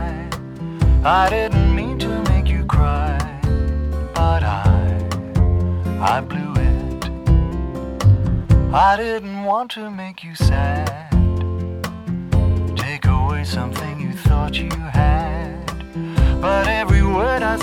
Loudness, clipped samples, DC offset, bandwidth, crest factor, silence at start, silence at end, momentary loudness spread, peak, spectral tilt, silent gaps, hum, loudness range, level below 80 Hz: -19 LUFS; under 0.1%; under 0.1%; 14.5 kHz; 16 dB; 0 s; 0 s; 10 LU; -2 dBFS; -7 dB/octave; none; none; 3 LU; -22 dBFS